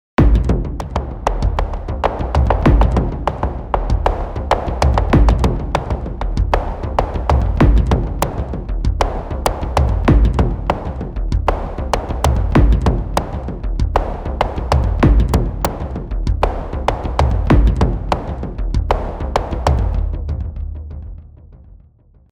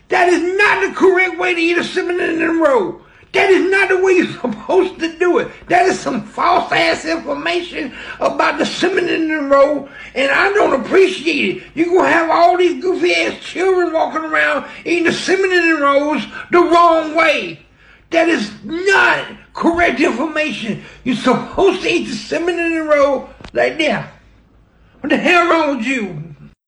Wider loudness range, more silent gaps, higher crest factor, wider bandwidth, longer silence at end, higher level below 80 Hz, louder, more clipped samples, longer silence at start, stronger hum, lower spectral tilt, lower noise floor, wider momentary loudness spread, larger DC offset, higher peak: about the same, 2 LU vs 3 LU; neither; about the same, 16 dB vs 12 dB; first, 18 kHz vs 10.5 kHz; first, 0.75 s vs 0.2 s; first, -18 dBFS vs -48 dBFS; second, -18 LUFS vs -15 LUFS; neither; about the same, 0.2 s vs 0.1 s; neither; first, -7 dB/octave vs -4 dB/octave; about the same, -49 dBFS vs -49 dBFS; about the same, 10 LU vs 9 LU; neither; about the same, 0 dBFS vs -2 dBFS